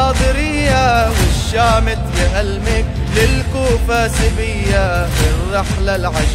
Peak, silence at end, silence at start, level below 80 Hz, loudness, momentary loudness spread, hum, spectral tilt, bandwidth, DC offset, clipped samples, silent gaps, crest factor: -2 dBFS; 0 s; 0 s; -18 dBFS; -15 LUFS; 4 LU; none; -5 dB/octave; 16 kHz; under 0.1%; under 0.1%; none; 12 dB